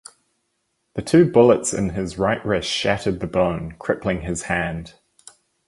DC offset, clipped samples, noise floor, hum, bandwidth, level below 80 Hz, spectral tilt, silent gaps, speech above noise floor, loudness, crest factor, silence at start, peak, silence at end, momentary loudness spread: under 0.1%; under 0.1%; -72 dBFS; none; 11.5 kHz; -44 dBFS; -5 dB/octave; none; 52 dB; -20 LUFS; 20 dB; 0.95 s; -2 dBFS; 0.8 s; 13 LU